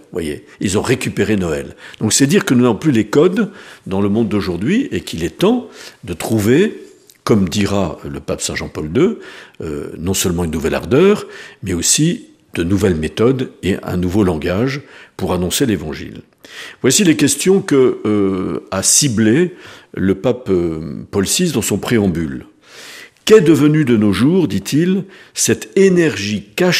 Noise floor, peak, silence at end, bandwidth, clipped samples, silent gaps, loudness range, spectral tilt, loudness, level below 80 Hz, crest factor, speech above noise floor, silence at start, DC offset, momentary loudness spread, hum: -37 dBFS; 0 dBFS; 0 s; 15.5 kHz; under 0.1%; none; 4 LU; -4.5 dB/octave; -15 LUFS; -42 dBFS; 16 dB; 22 dB; 0.1 s; under 0.1%; 15 LU; none